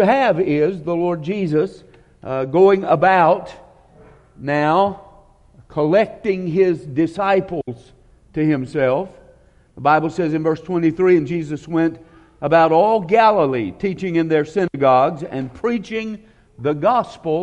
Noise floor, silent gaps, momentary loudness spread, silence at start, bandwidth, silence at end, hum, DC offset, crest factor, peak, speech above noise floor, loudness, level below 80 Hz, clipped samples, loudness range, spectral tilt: -50 dBFS; none; 13 LU; 0 s; 9 kHz; 0 s; none; under 0.1%; 16 dB; -2 dBFS; 33 dB; -18 LUFS; -52 dBFS; under 0.1%; 4 LU; -7.5 dB/octave